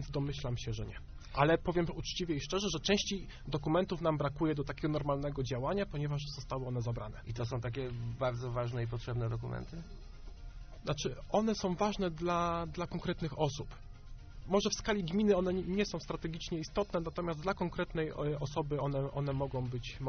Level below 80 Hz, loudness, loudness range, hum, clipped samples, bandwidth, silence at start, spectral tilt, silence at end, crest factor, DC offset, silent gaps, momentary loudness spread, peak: -48 dBFS; -36 LUFS; 4 LU; none; under 0.1%; 6.6 kHz; 0 s; -5.5 dB/octave; 0 s; 20 dB; under 0.1%; none; 12 LU; -14 dBFS